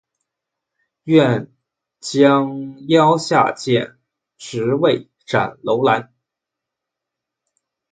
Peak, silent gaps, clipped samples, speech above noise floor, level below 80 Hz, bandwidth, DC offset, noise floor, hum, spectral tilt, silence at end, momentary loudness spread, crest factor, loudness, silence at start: 0 dBFS; none; under 0.1%; 67 dB; -62 dBFS; 9.4 kHz; under 0.1%; -83 dBFS; none; -6 dB/octave; 1.9 s; 15 LU; 18 dB; -17 LUFS; 1.05 s